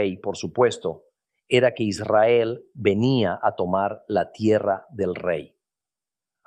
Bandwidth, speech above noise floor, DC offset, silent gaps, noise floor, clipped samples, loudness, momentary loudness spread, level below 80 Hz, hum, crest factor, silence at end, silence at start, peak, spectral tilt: 10 kHz; over 68 dB; under 0.1%; none; under -90 dBFS; under 0.1%; -23 LUFS; 9 LU; -62 dBFS; none; 18 dB; 1 s; 0 s; -4 dBFS; -6 dB/octave